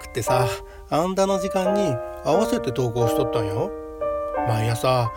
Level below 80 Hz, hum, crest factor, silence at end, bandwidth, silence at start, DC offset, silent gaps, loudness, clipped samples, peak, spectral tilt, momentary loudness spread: -44 dBFS; none; 16 dB; 0 s; 17.5 kHz; 0 s; under 0.1%; none; -23 LUFS; under 0.1%; -6 dBFS; -6 dB/octave; 6 LU